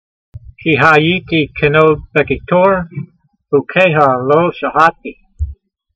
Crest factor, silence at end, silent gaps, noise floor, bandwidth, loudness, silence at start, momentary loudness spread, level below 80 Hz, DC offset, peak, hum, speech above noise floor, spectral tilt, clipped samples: 14 dB; 0.4 s; none; -34 dBFS; 8.2 kHz; -12 LUFS; 0.35 s; 17 LU; -34 dBFS; under 0.1%; 0 dBFS; none; 22 dB; -7 dB/octave; under 0.1%